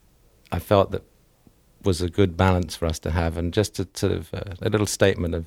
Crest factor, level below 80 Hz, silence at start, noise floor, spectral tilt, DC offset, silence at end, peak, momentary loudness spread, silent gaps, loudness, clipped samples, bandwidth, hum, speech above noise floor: 22 dB; -40 dBFS; 0.5 s; -57 dBFS; -5.5 dB/octave; under 0.1%; 0 s; -2 dBFS; 9 LU; none; -24 LUFS; under 0.1%; 16 kHz; none; 35 dB